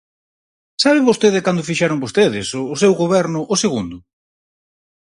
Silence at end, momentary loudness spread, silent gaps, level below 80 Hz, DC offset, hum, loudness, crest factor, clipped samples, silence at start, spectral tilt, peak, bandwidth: 1.05 s; 9 LU; none; -54 dBFS; under 0.1%; none; -16 LUFS; 18 dB; under 0.1%; 0.8 s; -4.5 dB/octave; 0 dBFS; 11.5 kHz